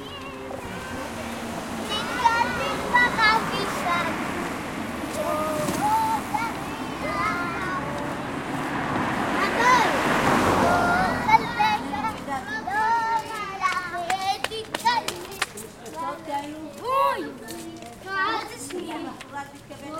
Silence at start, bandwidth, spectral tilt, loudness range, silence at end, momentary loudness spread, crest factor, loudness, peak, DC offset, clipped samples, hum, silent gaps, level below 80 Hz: 0 s; 16.5 kHz; -4 dB/octave; 7 LU; 0 s; 14 LU; 20 dB; -25 LUFS; -4 dBFS; under 0.1%; under 0.1%; none; none; -50 dBFS